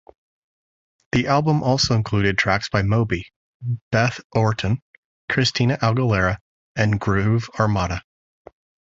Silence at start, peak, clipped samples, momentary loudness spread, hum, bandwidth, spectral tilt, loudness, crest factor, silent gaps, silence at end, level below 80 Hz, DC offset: 1.15 s; -2 dBFS; under 0.1%; 10 LU; none; 7.8 kHz; -5.5 dB/octave; -21 LUFS; 18 dB; 3.36-3.60 s, 3.81-3.91 s, 4.24-4.30 s, 4.82-5.28 s, 6.41-6.75 s; 0.85 s; -42 dBFS; under 0.1%